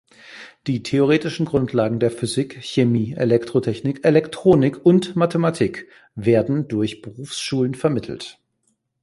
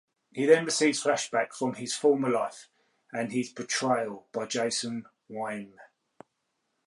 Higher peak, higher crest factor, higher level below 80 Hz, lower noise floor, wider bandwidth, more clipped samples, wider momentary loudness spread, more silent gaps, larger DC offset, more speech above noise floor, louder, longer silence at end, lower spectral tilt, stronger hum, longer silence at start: first, -2 dBFS vs -8 dBFS; about the same, 18 dB vs 22 dB; first, -54 dBFS vs -80 dBFS; second, -69 dBFS vs -79 dBFS; about the same, 11.5 kHz vs 11.5 kHz; neither; about the same, 15 LU vs 15 LU; neither; neither; about the same, 50 dB vs 51 dB; first, -20 LUFS vs -28 LUFS; second, 0.7 s vs 1 s; first, -6.5 dB/octave vs -3.5 dB/octave; neither; about the same, 0.3 s vs 0.35 s